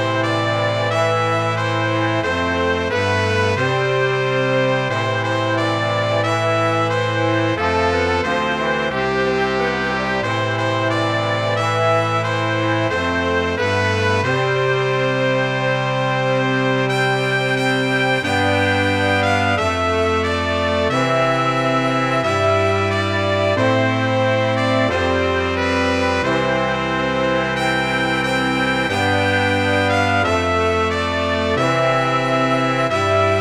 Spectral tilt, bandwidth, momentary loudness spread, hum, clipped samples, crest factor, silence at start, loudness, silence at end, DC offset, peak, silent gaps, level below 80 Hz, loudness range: -5.5 dB/octave; 13 kHz; 2 LU; none; under 0.1%; 14 dB; 0 s; -18 LUFS; 0 s; under 0.1%; -4 dBFS; none; -44 dBFS; 1 LU